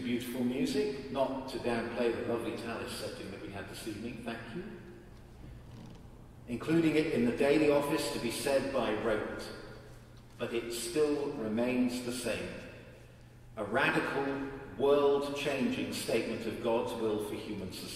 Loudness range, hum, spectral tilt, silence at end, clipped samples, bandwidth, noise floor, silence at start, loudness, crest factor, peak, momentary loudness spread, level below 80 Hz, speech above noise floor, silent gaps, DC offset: 9 LU; none; -5 dB/octave; 0 s; under 0.1%; 16 kHz; -54 dBFS; 0 s; -33 LUFS; 18 dB; -16 dBFS; 21 LU; -58 dBFS; 21 dB; none; under 0.1%